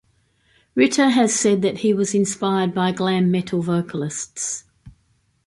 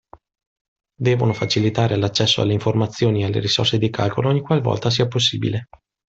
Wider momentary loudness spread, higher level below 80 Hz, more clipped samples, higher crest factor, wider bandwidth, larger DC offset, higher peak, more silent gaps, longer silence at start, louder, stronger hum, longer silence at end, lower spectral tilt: first, 10 LU vs 4 LU; second, -60 dBFS vs -52 dBFS; neither; about the same, 16 dB vs 16 dB; first, 11.5 kHz vs 8 kHz; neither; about the same, -4 dBFS vs -4 dBFS; neither; second, 0.75 s vs 1 s; about the same, -20 LUFS vs -19 LUFS; neither; about the same, 0.55 s vs 0.45 s; about the same, -4.5 dB/octave vs -5.5 dB/octave